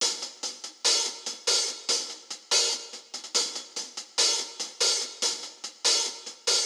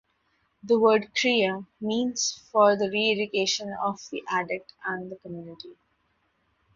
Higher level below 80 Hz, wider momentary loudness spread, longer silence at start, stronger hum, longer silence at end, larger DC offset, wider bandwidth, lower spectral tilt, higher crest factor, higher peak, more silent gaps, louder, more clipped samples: second, under -90 dBFS vs -70 dBFS; second, 12 LU vs 18 LU; second, 0 s vs 0.65 s; neither; second, 0 s vs 1.05 s; neither; first, over 20 kHz vs 7.6 kHz; second, 3 dB/octave vs -3 dB/octave; about the same, 20 dB vs 20 dB; about the same, -8 dBFS vs -6 dBFS; neither; about the same, -26 LUFS vs -25 LUFS; neither